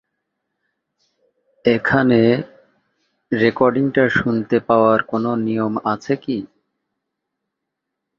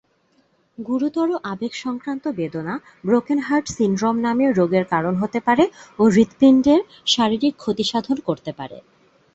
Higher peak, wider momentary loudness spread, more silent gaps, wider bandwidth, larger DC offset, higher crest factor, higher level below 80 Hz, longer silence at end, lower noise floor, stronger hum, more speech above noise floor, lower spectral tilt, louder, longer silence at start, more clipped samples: about the same, 0 dBFS vs -2 dBFS; second, 8 LU vs 12 LU; neither; second, 7 kHz vs 8 kHz; neither; about the same, 18 dB vs 18 dB; about the same, -54 dBFS vs -56 dBFS; first, 1.75 s vs 0.55 s; first, -80 dBFS vs -62 dBFS; neither; first, 63 dB vs 43 dB; first, -7.5 dB/octave vs -5.5 dB/octave; about the same, -18 LUFS vs -20 LUFS; first, 1.65 s vs 0.8 s; neither